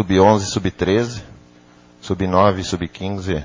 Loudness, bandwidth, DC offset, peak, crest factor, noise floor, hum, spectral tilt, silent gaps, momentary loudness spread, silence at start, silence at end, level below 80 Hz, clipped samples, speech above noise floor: -18 LUFS; 7.6 kHz; under 0.1%; 0 dBFS; 18 dB; -48 dBFS; none; -6 dB/octave; none; 13 LU; 0 s; 0 s; -38 dBFS; under 0.1%; 31 dB